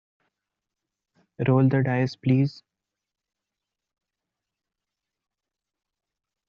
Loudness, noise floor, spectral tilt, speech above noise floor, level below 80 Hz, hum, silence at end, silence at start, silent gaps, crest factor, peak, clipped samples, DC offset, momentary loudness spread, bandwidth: -23 LUFS; -87 dBFS; -8 dB/octave; 66 dB; -66 dBFS; none; 4 s; 1.4 s; none; 20 dB; -10 dBFS; under 0.1%; under 0.1%; 7 LU; 6.6 kHz